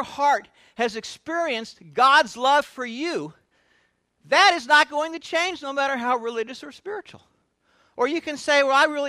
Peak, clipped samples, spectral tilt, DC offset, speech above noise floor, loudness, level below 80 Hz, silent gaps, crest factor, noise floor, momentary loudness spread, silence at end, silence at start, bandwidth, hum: -2 dBFS; under 0.1%; -2 dB/octave; under 0.1%; 44 dB; -21 LUFS; -70 dBFS; none; 20 dB; -67 dBFS; 17 LU; 0 s; 0 s; 14.5 kHz; none